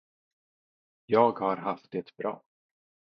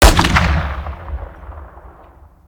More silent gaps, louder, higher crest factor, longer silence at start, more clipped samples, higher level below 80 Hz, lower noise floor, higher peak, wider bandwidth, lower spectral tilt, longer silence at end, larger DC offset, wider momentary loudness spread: neither; second, -29 LUFS vs -16 LUFS; first, 24 dB vs 16 dB; first, 1.1 s vs 0 s; neither; second, -78 dBFS vs -20 dBFS; first, under -90 dBFS vs -43 dBFS; second, -8 dBFS vs 0 dBFS; second, 5.8 kHz vs over 20 kHz; first, -9 dB/octave vs -4 dB/octave; about the same, 0.65 s vs 0.6 s; neither; second, 13 LU vs 23 LU